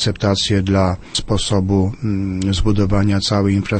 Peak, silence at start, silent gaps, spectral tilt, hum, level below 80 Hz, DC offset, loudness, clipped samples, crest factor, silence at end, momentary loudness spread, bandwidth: -4 dBFS; 0 s; none; -5.5 dB/octave; none; -30 dBFS; under 0.1%; -17 LUFS; under 0.1%; 14 dB; 0 s; 4 LU; 8.8 kHz